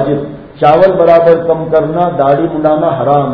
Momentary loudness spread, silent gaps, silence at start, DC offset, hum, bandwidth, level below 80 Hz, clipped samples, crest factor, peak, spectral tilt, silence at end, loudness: 7 LU; none; 0 s; under 0.1%; none; 6 kHz; -42 dBFS; 1%; 10 dB; 0 dBFS; -9.5 dB/octave; 0 s; -10 LUFS